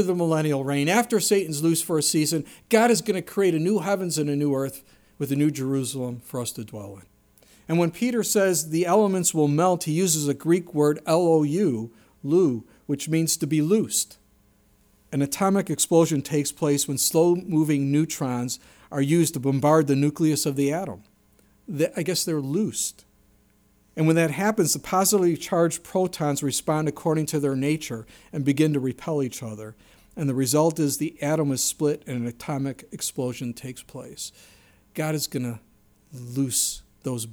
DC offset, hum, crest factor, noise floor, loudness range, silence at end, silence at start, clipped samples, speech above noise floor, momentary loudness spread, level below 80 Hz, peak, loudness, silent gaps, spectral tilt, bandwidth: under 0.1%; none; 18 dB; -61 dBFS; 7 LU; 0 s; 0 s; under 0.1%; 38 dB; 13 LU; -62 dBFS; -6 dBFS; -23 LUFS; none; -5 dB/octave; over 20 kHz